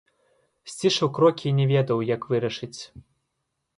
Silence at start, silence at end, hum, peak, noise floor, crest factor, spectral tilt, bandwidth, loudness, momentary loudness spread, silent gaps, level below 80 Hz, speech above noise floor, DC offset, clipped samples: 0.65 s; 0.8 s; none; -6 dBFS; -78 dBFS; 18 dB; -6 dB/octave; 11.5 kHz; -23 LUFS; 18 LU; none; -64 dBFS; 55 dB; under 0.1%; under 0.1%